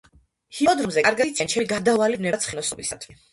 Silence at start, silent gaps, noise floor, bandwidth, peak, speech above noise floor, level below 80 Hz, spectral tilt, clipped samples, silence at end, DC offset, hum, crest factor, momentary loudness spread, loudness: 0.5 s; none; -54 dBFS; 11.5 kHz; -6 dBFS; 31 dB; -58 dBFS; -3 dB/octave; under 0.1%; 0.2 s; under 0.1%; none; 18 dB; 11 LU; -22 LUFS